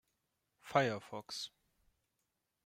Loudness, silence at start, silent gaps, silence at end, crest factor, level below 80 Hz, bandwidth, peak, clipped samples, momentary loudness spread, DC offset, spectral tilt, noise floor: -38 LUFS; 0.65 s; none; 1.2 s; 26 dB; -82 dBFS; 16 kHz; -16 dBFS; under 0.1%; 11 LU; under 0.1%; -4.5 dB/octave; -85 dBFS